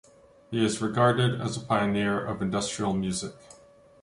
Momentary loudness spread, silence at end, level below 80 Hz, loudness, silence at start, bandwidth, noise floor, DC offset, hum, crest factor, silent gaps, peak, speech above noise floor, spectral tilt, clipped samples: 9 LU; 0.5 s; -56 dBFS; -27 LUFS; 0.5 s; 11.5 kHz; -55 dBFS; under 0.1%; none; 20 dB; none; -8 dBFS; 28 dB; -5 dB/octave; under 0.1%